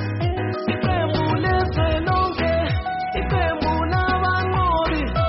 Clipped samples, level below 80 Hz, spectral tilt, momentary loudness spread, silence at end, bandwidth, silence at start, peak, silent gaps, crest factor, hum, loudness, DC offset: under 0.1%; -30 dBFS; -5 dB/octave; 4 LU; 0 s; 5.8 kHz; 0 s; -8 dBFS; none; 12 dB; none; -21 LUFS; under 0.1%